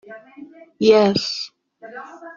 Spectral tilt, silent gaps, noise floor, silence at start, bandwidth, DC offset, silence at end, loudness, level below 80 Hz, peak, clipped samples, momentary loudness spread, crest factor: -5 dB/octave; none; -43 dBFS; 0.1 s; 7.4 kHz; under 0.1%; 0.05 s; -17 LUFS; -62 dBFS; -2 dBFS; under 0.1%; 24 LU; 18 dB